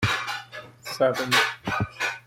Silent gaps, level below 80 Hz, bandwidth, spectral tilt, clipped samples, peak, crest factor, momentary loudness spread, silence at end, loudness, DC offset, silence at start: none; -54 dBFS; 16.5 kHz; -3.5 dB/octave; under 0.1%; -8 dBFS; 18 dB; 16 LU; 0.1 s; -24 LUFS; under 0.1%; 0 s